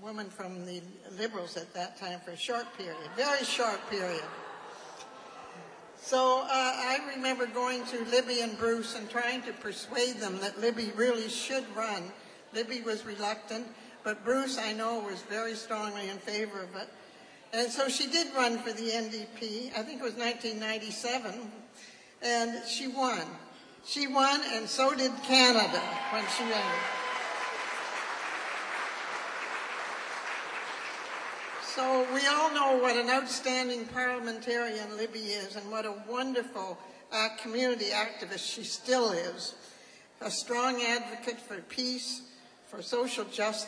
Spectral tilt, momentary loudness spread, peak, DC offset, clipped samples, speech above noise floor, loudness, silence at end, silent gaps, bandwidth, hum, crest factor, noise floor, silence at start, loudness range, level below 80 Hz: -2 dB/octave; 15 LU; -8 dBFS; under 0.1%; under 0.1%; 22 dB; -32 LUFS; 0 s; none; 10.5 kHz; none; 24 dB; -54 dBFS; 0 s; 8 LU; -80 dBFS